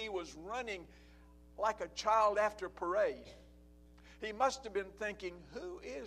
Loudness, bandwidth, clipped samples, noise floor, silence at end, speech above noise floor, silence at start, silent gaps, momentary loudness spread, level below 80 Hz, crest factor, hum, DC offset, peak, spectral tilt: -37 LUFS; 13.5 kHz; under 0.1%; -60 dBFS; 0 s; 23 dB; 0 s; none; 16 LU; -62 dBFS; 20 dB; none; under 0.1%; -18 dBFS; -3.5 dB/octave